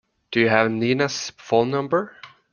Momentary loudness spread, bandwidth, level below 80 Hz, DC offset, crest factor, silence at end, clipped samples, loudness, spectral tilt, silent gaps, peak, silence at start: 8 LU; 10 kHz; -62 dBFS; under 0.1%; 22 dB; 0.25 s; under 0.1%; -21 LUFS; -5 dB/octave; none; -2 dBFS; 0.3 s